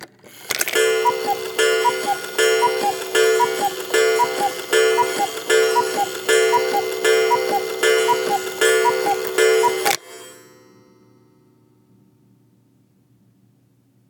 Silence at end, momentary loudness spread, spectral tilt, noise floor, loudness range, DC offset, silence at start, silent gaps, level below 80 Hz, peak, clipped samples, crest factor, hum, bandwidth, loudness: 3.75 s; 6 LU; -1 dB/octave; -58 dBFS; 4 LU; under 0.1%; 0 s; none; -72 dBFS; 0 dBFS; under 0.1%; 20 dB; none; 19.5 kHz; -18 LUFS